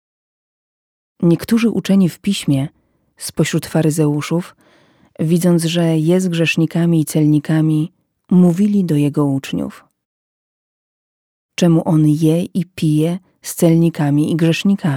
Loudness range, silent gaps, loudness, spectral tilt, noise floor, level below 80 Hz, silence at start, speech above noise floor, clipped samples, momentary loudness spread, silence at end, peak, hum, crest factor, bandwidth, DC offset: 4 LU; 10.05-11.49 s; -16 LUFS; -6.5 dB/octave; -52 dBFS; -56 dBFS; 1.2 s; 37 dB; under 0.1%; 10 LU; 0 s; -2 dBFS; none; 14 dB; 16.5 kHz; under 0.1%